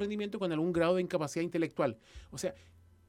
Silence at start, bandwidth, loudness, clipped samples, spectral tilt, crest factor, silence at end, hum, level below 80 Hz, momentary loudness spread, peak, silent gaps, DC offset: 0 s; 15.5 kHz; -33 LUFS; under 0.1%; -6 dB/octave; 18 dB; 0.5 s; none; -62 dBFS; 10 LU; -16 dBFS; none; under 0.1%